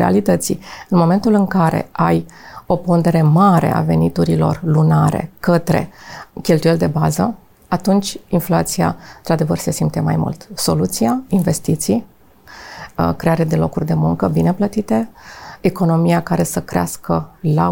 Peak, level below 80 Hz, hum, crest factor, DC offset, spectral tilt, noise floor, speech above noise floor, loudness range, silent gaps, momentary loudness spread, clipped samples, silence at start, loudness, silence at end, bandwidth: -2 dBFS; -42 dBFS; none; 14 dB; under 0.1%; -6.5 dB/octave; -41 dBFS; 26 dB; 4 LU; none; 9 LU; under 0.1%; 0 s; -16 LUFS; 0 s; 17 kHz